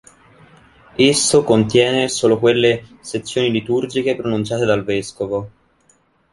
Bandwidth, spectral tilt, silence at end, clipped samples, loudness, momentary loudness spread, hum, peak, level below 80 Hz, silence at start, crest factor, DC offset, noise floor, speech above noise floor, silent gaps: 11.5 kHz; -4 dB/octave; 0.85 s; under 0.1%; -17 LUFS; 11 LU; none; -2 dBFS; -52 dBFS; 1 s; 16 dB; under 0.1%; -58 dBFS; 41 dB; none